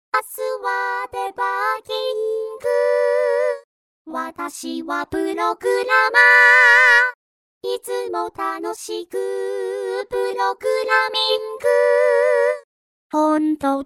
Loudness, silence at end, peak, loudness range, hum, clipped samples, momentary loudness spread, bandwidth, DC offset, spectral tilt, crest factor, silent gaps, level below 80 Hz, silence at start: -18 LUFS; 0 s; 0 dBFS; 9 LU; none; under 0.1%; 17 LU; 16.5 kHz; under 0.1%; -2 dB/octave; 18 dB; 3.64-4.05 s, 7.15-7.61 s, 12.64-13.10 s; -62 dBFS; 0.15 s